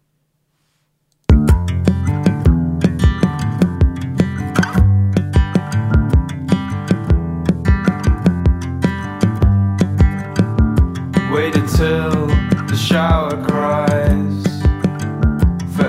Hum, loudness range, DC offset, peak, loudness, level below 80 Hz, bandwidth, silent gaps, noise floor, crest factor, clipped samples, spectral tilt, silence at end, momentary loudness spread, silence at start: none; 1 LU; under 0.1%; 0 dBFS; -16 LUFS; -20 dBFS; 15 kHz; none; -66 dBFS; 14 dB; under 0.1%; -7.5 dB/octave; 0 s; 5 LU; 1.3 s